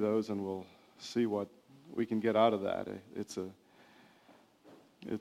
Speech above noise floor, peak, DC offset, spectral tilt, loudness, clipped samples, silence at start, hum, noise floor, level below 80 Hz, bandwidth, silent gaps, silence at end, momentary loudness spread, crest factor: 29 dB; -14 dBFS; under 0.1%; -6 dB/octave; -35 LUFS; under 0.1%; 0 s; none; -63 dBFS; -78 dBFS; 15 kHz; none; 0 s; 17 LU; 22 dB